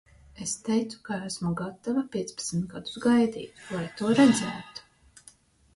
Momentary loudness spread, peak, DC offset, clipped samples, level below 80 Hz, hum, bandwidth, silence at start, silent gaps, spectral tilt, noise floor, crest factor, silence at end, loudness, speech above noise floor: 15 LU; -8 dBFS; under 0.1%; under 0.1%; -60 dBFS; none; 11.5 kHz; 0.35 s; none; -5 dB/octave; -57 dBFS; 20 dB; 0.95 s; -27 LUFS; 30 dB